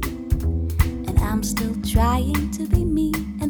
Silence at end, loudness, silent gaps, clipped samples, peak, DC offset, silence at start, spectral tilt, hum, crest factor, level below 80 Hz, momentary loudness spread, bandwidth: 0 s; -22 LUFS; none; under 0.1%; -4 dBFS; under 0.1%; 0 s; -6 dB/octave; none; 16 dB; -26 dBFS; 4 LU; over 20 kHz